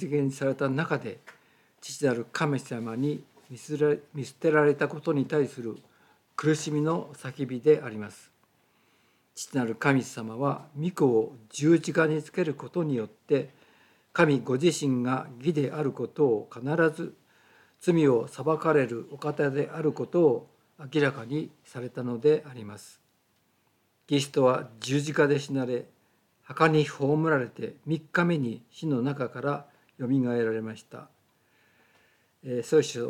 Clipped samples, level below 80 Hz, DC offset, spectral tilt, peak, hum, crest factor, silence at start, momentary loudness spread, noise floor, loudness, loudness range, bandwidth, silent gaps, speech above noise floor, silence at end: under 0.1%; -80 dBFS; under 0.1%; -6 dB/octave; -6 dBFS; none; 22 dB; 0 s; 16 LU; -70 dBFS; -27 LUFS; 4 LU; 14 kHz; none; 43 dB; 0 s